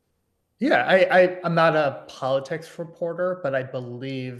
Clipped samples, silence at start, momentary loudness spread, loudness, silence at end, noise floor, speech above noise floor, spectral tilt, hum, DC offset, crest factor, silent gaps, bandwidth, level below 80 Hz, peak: under 0.1%; 0.6 s; 15 LU; -22 LUFS; 0 s; -73 dBFS; 50 dB; -6.5 dB/octave; none; under 0.1%; 18 dB; none; 12 kHz; -72 dBFS; -6 dBFS